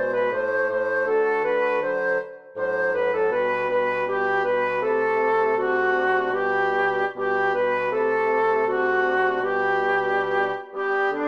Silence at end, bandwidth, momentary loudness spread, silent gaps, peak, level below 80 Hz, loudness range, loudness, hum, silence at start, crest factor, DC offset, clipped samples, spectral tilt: 0 s; 6.8 kHz; 3 LU; none; -12 dBFS; -74 dBFS; 1 LU; -22 LUFS; none; 0 s; 10 dB; 0.1%; under 0.1%; -6 dB/octave